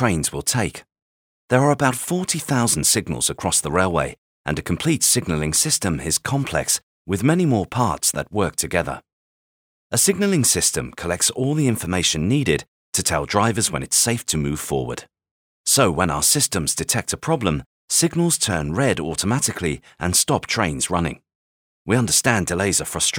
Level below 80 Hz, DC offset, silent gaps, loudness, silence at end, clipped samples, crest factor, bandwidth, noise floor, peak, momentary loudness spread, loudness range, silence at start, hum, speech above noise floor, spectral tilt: -42 dBFS; under 0.1%; 1.02-1.48 s, 4.18-4.45 s, 6.83-7.05 s, 9.13-9.90 s, 12.68-12.92 s, 15.31-15.64 s, 17.66-17.88 s, 21.35-21.85 s; -20 LUFS; 0 s; under 0.1%; 20 dB; over 20 kHz; under -90 dBFS; -2 dBFS; 8 LU; 2 LU; 0 s; none; over 70 dB; -3.5 dB/octave